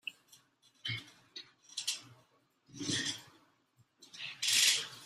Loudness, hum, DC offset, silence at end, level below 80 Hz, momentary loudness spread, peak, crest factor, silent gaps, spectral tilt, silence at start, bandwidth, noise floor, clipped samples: -33 LUFS; none; under 0.1%; 0 s; -78 dBFS; 24 LU; -14 dBFS; 26 dB; none; 0 dB/octave; 0.05 s; 15.5 kHz; -72 dBFS; under 0.1%